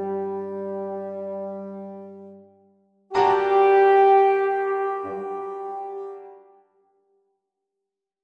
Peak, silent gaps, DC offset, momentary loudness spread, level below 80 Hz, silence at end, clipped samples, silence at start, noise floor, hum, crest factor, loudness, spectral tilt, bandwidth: -8 dBFS; none; under 0.1%; 21 LU; -70 dBFS; 1.85 s; under 0.1%; 0 s; -84 dBFS; none; 16 dB; -22 LUFS; -6.5 dB/octave; 6.6 kHz